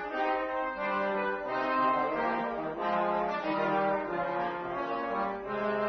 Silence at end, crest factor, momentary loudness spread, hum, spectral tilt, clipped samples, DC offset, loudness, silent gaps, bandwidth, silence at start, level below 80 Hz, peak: 0 s; 12 dB; 5 LU; none; -3.5 dB/octave; under 0.1%; under 0.1%; -31 LUFS; none; 6.4 kHz; 0 s; -62 dBFS; -18 dBFS